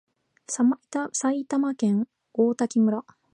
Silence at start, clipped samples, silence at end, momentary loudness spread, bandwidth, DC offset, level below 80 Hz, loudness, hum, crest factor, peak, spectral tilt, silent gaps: 0.5 s; under 0.1%; 0.35 s; 7 LU; 10.5 kHz; under 0.1%; -80 dBFS; -25 LUFS; none; 16 dB; -10 dBFS; -5.5 dB/octave; none